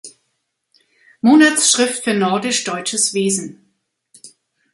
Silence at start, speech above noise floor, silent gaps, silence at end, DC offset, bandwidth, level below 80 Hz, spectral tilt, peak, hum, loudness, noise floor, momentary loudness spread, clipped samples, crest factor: 0.05 s; 56 dB; none; 0.45 s; under 0.1%; 12 kHz; -66 dBFS; -2.5 dB/octave; 0 dBFS; none; -15 LUFS; -71 dBFS; 9 LU; under 0.1%; 18 dB